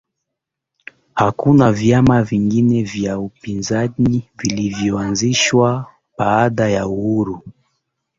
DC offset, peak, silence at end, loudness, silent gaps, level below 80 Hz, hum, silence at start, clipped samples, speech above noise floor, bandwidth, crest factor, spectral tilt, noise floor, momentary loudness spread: under 0.1%; -2 dBFS; 0.7 s; -16 LUFS; none; -44 dBFS; none; 1.15 s; under 0.1%; 65 dB; 7.8 kHz; 16 dB; -5.5 dB/octave; -80 dBFS; 12 LU